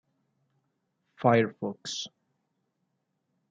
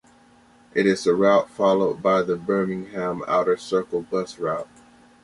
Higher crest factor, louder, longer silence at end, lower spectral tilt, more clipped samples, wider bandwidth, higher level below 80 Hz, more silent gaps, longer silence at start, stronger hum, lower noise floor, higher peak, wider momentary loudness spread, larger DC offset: first, 24 dB vs 18 dB; second, -28 LUFS vs -22 LUFS; first, 1.45 s vs 0.6 s; about the same, -5 dB/octave vs -6 dB/octave; neither; second, 9.2 kHz vs 11.5 kHz; second, -80 dBFS vs -62 dBFS; neither; first, 1.2 s vs 0.75 s; neither; first, -79 dBFS vs -54 dBFS; second, -10 dBFS vs -6 dBFS; first, 12 LU vs 9 LU; neither